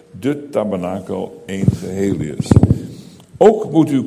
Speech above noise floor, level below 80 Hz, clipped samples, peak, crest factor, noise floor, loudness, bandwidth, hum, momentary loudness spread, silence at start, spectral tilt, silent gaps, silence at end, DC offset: 21 dB; -32 dBFS; 0.2%; 0 dBFS; 16 dB; -37 dBFS; -17 LUFS; 15 kHz; none; 12 LU; 0.15 s; -8 dB/octave; none; 0 s; under 0.1%